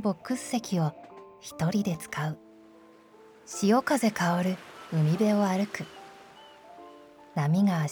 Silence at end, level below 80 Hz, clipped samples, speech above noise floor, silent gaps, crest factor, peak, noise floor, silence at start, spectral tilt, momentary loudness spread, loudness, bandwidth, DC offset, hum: 0 s; -68 dBFS; under 0.1%; 28 dB; none; 16 dB; -12 dBFS; -54 dBFS; 0 s; -6 dB/octave; 23 LU; -28 LUFS; 19.5 kHz; under 0.1%; none